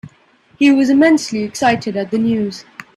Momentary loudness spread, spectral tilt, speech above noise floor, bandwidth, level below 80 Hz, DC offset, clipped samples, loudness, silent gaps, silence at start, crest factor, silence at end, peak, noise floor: 10 LU; -5 dB/octave; 38 dB; 12 kHz; -56 dBFS; under 0.1%; under 0.1%; -15 LUFS; none; 0.05 s; 16 dB; 0.35 s; 0 dBFS; -52 dBFS